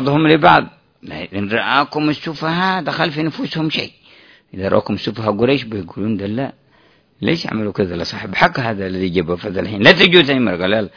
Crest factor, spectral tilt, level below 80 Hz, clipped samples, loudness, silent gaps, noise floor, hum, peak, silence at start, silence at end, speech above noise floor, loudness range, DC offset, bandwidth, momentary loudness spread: 16 dB; -6.5 dB/octave; -48 dBFS; 0.2%; -16 LUFS; none; -53 dBFS; none; 0 dBFS; 0 s; 0.1 s; 37 dB; 6 LU; under 0.1%; 5.4 kHz; 14 LU